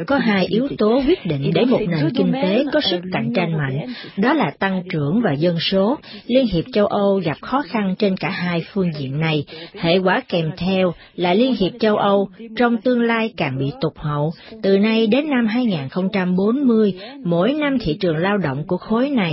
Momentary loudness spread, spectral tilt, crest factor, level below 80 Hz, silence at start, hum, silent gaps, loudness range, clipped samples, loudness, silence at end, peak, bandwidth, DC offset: 6 LU; -11 dB/octave; 14 dB; -48 dBFS; 0 s; none; none; 2 LU; under 0.1%; -19 LUFS; 0 s; -4 dBFS; 5.8 kHz; under 0.1%